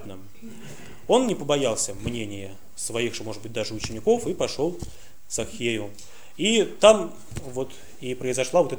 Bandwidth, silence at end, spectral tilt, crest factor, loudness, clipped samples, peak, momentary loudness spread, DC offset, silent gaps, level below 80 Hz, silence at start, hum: over 20 kHz; 0 s; -3.5 dB/octave; 24 dB; -25 LUFS; under 0.1%; -2 dBFS; 20 LU; 2%; none; -50 dBFS; 0 s; none